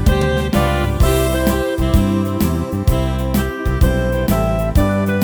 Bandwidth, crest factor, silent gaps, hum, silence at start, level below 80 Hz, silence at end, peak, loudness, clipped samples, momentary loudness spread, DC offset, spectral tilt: over 20 kHz; 16 dB; none; none; 0 s; -20 dBFS; 0 s; 0 dBFS; -17 LUFS; under 0.1%; 3 LU; under 0.1%; -6.5 dB/octave